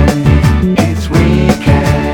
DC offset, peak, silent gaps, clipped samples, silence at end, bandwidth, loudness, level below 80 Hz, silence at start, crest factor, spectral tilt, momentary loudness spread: under 0.1%; 0 dBFS; none; 0.5%; 0 s; 17.5 kHz; -10 LUFS; -16 dBFS; 0 s; 10 dB; -7 dB/octave; 2 LU